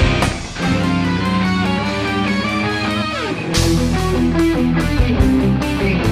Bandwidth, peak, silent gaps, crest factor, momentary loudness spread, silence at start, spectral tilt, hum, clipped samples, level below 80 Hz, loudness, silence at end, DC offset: 15.5 kHz; -4 dBFS; none; 12 dB; 4 LU; 0 s; -5.5 dB/octave; none; under 0.1%; -26 dBFS; -17 LUFS; 0 s; under 0.1%